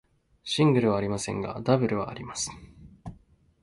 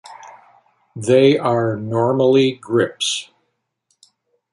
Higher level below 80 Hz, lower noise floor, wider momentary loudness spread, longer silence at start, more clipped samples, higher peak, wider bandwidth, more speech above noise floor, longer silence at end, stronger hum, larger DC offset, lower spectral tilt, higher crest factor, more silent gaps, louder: first, -56 dBFS vs -62 dBFS; second, -58 dBFS vs -72 dBFS; first, 23 LU vs 10 LU; first, 0.45 s vs 0.1 s; neither; second, -8 dBFS vs -2 dBFS; about the same, 11.5 kHz vs 11.5 kHz; second, 32 dB vs 55 dB; second, 0.5 s vs 1.3 s; neither; neither; about the same, -5.5 dB/octave vs -5 dB/octave; about the same, 20 dB vs 16 dB; neither; second, -27 LUFS vs -17 LUFS